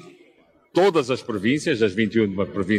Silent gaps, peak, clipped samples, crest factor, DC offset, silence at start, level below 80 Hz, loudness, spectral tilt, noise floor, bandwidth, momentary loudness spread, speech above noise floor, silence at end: none; -6 dBFS; under 0.1%; 16 dB; under 0.1%; 0.05 s; -62 dBFS; -22 LUFS; -6 dB/octave; -57 dBFS; 12.5 kHz; 7 LU; 37 dB; 0 s